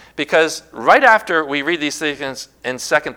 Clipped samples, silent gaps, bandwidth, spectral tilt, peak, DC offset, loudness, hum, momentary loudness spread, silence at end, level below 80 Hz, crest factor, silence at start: 0.2%; none; 18.5 kHz; -2.5 dB/octave; 0 dBFS; under 0.1%; -16 LUFS; none; 15 LU; 0.05 s; -58 dBFS; 18 dB; 0.15 s